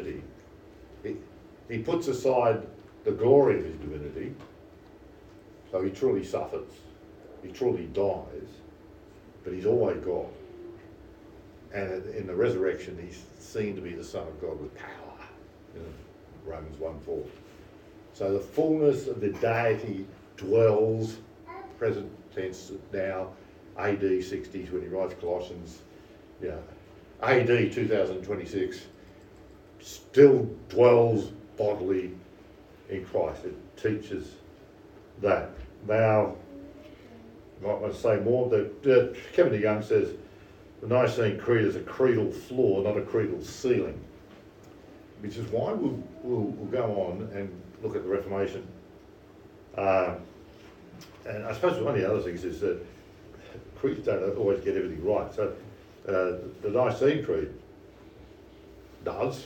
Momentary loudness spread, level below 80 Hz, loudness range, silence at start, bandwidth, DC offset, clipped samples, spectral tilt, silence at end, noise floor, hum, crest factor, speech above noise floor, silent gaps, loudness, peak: 22 LU; -56 dBFS; 8 LU; 0 s; 16.5 kHz; under 0.1%; under 0.1%; -7 dB/octave; 0 s; -52 dBFS; none; 24 dB; 24 dB; none; -28 LUFS; -6 dBFS